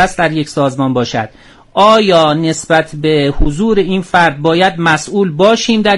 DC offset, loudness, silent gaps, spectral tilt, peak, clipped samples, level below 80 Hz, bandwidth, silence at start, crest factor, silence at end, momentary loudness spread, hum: under 0.1%; -12 LUFS; none; -5 dB/octave; 0 dBFS; under 0.1%; -28 dBFS; 11.5 kHz; 0 s; 12 dB; 0 s; 7 LU; none